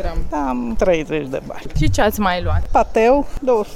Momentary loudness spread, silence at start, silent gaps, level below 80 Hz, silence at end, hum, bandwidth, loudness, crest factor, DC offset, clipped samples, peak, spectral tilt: 9 LU; 0 s; none; -26 dBFS; 0 s; none; 15.5 kHz; -19 LUFS; 14 dB; under 0.1%; under 0.1%; -4 dBFS; -6 dB/octave